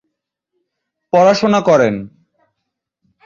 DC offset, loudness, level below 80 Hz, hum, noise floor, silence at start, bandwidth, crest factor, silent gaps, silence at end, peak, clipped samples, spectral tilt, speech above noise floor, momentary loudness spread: under 0.1%; -13 LUFS; -56 dBFS; none; -76 dBFS; 1.15 s; 7.6 kHz; 16 dB; none; 1.2 s; -2 dBFS; under 0.1%; -5.5 dB/octave; 64 dB; 6 LU